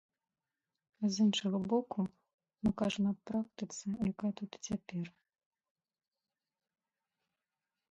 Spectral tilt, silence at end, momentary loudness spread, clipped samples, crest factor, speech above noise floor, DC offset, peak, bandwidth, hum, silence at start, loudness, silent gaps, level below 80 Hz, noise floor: -5.5 dB/octave; 2.8 s; 11 LU; under 0.1%; 18 dB; over 55 dB; under 0.1%; -20 dBFS; 8 kHz; none; 1 s; -36 LUFS; 2.34-2.38 s; -66 dBFS; under -90 dBFS